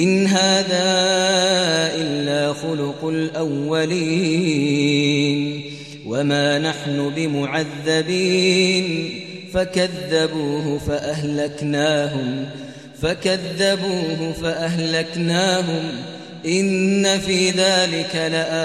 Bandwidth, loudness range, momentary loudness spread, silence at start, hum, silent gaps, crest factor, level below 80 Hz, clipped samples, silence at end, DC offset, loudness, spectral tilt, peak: 14 kHz; 3 LU; 9 LU; 0 s; none; none; 16 dB; -50 dBFS; under 0.1%; 0 s; 0.1%; -19 LUFS; -4.5 dB/octave; -4 dBFS